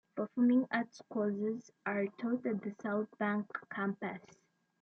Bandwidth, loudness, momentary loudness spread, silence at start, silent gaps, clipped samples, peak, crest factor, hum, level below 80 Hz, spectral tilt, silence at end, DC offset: 6.8 kHz; -36 LUFS; 11 LU; 0.15 s; none; under 0.1%; -20 dBFS; 16 dB; none; -84 dBFS; -7.5 dB/octave; 0.65 s; under 0.1%